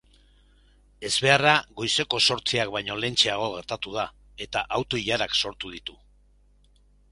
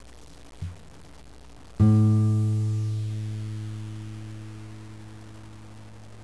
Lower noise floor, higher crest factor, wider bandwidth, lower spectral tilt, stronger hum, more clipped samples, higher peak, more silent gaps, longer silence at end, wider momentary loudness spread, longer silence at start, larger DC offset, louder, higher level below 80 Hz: first, -59 dBFS vs -45 dBFS; first, 26 dB vs 18 dB; about the same, 11.5 kHz vs 11 kHz; second, -2.5 dB/octave vs -8.5 dB/octave; first, 50 Hz at -55 dBFS vs none; neither; first, -2 dBFS vs -8 dBFS; neither; first, 1.2 s vs 0 s; second, 16 LU vs 25 LU; first, 1 s vs 0 s; second, under 0.1% vs 0.4%; about the same, -24 LUFS vs -25 LUFS; about the same, -54 dBFS vs -50 dBFS